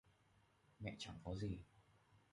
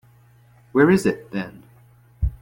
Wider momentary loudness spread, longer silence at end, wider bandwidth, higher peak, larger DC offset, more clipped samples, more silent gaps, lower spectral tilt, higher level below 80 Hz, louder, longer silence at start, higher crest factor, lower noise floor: second, 7 LU vs 14 LU; about the same, 0.15 s vs 0.05 s; second, 11 kHz vs 16.5 kHz; second, -34 dBFS vs -4 dBFS; neither; neither; neither; about the same, -6 dB/octave vs -7 dB/octave; second, -64 dBFS vs -36 dBFS; second, -50 LUFS vs -21 LUFS; second, 0.05 s vs 0.75 s; about the same, 18 dB vs 18 dB; first, -76 dBFS vs -53 dBFS